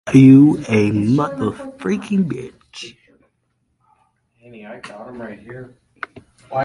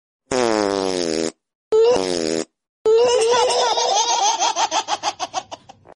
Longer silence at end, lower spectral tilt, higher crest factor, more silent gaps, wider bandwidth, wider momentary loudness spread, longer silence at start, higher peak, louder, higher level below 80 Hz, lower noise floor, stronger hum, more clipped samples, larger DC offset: second, 0 s vs 0.4 s; first, -8 dB/octave vs -2 dB/octave; about the same, 18 dB vs 14 dB; second, none vs 1.55-1.71 s, 2.69-2.85 s; about the same, 11.5 kHz vs 11.5 kHz; first, 26 LU vs 12 LU; second, 0.05 s vs 0.3 s; first, 0 dBFS vs -6 dBFS; first, -15 LUFS vs -19 LUFS; about the same, -52 dBFS vs -56 dBFS; first, -68 dBFS vs -40 dBFS; neither; neither; neither